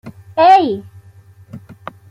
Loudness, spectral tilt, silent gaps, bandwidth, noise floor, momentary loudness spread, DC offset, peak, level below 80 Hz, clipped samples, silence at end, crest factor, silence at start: -12 LUFS; -6 dB/octave; none; 8 kHz; -43 dBFS; 25 LU; under 0.1%; -2 dBFS; -58 dBFS; under 0.1%; 0.55 s; 16 dB; 0.05 s